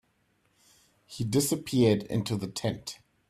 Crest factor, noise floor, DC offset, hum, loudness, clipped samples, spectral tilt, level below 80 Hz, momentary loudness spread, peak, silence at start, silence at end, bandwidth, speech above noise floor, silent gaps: 20 dB; -71 dBFS; under 0.1%; none; -28 LUFS; under 0.1%; -5.5 dB/octave; -60 dBFS; 14 LU; -12 dBFS; 1.1 s; 0.35 s; 15.5 kHz; 43 dB; none